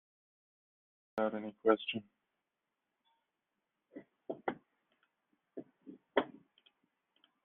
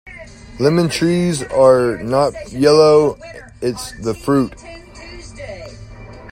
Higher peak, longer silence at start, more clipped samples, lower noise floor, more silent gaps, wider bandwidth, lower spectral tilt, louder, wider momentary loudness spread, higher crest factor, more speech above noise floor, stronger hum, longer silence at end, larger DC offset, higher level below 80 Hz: second, -14 dBFS vs 0 dBFS; first, 1.15 s vs 0.05 s; neither; first, -88 dBFS vs -36 dBFS; neither; second, 4 kHz vs 15.5 kHz; second, -2.5 dB/octave vs -6 dB/octave; second, -37 LUFS vs -15 LUFS; about the same, 24 LU vs 25 LU; first, 28 dB vs 16 dB; first, 54 dB vs 21 dB; neither; first, 1.15 s vs 0 s; neither; second, -82 dBFS vs -42 dBFS